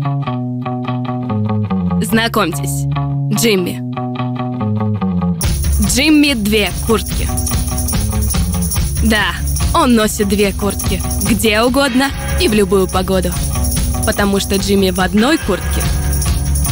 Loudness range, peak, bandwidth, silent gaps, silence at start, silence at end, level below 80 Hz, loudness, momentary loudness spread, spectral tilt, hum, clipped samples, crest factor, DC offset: 3 LU; -2 dBFS; 16.5 kHz; none; 0 s; 0 s; -22 dBFS; -15 LUFS; 7 LU; -4.5 dB/octave; none; under 0.1%; 12 dB; under 0.1%